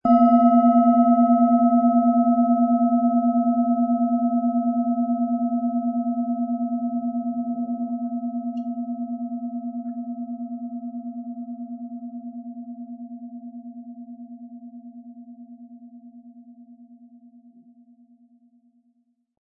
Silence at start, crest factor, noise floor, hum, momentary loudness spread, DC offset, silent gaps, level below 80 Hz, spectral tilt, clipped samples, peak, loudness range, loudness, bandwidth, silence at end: 0.05 s; 16 dB; -68 dBFS; none; 23 LU; under 0.1%; none; -72 dBFS; -12.5 dB/octave; under 0.1%; -6 dBFS; 22 LU; -21 LUFS; 3 kHz; 2.45 s